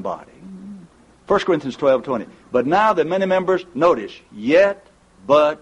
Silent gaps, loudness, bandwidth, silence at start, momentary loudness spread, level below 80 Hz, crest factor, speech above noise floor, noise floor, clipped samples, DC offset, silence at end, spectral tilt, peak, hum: none; -18 LUFS; 9.4 kHz; 0 s; 19 LU; -56 dBFS; 16 dB; 29 dB; -47 dBFS; under 0.1%; under 0.1%; 0.05 s; -6 dB/octave; -4 dBFS; none